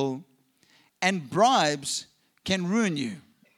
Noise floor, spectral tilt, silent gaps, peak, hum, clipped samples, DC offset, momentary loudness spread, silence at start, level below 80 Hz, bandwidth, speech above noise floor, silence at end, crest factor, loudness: -63 dBFS; -4 dB/octave; none; -6 dBFS; none; under 0.1%; under 0.1%; 16 LU; 0 s; -68 dBFS; 15 kHz; 38 dB; 0.35 s; 22 dB; -26 LUFS